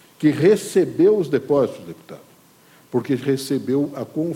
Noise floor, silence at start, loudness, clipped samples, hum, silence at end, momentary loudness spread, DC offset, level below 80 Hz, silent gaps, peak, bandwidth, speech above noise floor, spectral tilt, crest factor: -52 dBFS; 0.2 s; -20 LUFS; under 0.1%; none; 0 s; 10 LU; under 0.1%; -64 dBFS; none; -4 dBFS; 16.5 kHz; 32 dB; -6.5 dB/octave; 16 dB